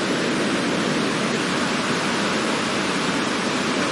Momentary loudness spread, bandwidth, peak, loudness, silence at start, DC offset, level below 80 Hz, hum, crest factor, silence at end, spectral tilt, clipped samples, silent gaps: 1 LU; 11.5 kHz; -8 dBFS; -22 LUFS; 0 s; under 0.1%; -56 dBFS; none; 14 dB; 0 s; -3.5 dB/octave; under 0.1%; none